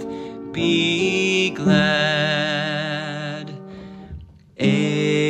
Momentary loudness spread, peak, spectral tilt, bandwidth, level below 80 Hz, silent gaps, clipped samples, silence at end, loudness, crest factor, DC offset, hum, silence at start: 20 LU; -4 dBFS; -5 dB/octave; 10 kHz; -52 dBFS; none; under 0.1%; 0 s; -20 LUFS; 18 dB; under 0.1%; none; 0 s